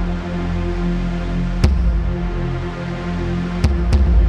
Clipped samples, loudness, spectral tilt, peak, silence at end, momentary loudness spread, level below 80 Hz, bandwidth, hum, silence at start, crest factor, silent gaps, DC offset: under 0.1%; -21 LUFS; -7.5 dB/octave; -2 dBFS; 0 s; 7 LU; -20 dBFS; 8.8 kHz; none; 0 s; 14 dB; none; under 0.1%